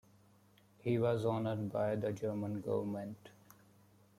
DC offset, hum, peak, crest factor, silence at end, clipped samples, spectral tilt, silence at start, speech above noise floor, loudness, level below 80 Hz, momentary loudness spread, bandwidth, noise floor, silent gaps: under 0.1%; none; -22 dBFS; 18 dB; 0.9 s; under 0.1%; -8 dB/octave; 0.85 s; 31 dB; -37 LUFS; -74 dBFS; 10 LU; 15.5 kHz; -67 dBFS; none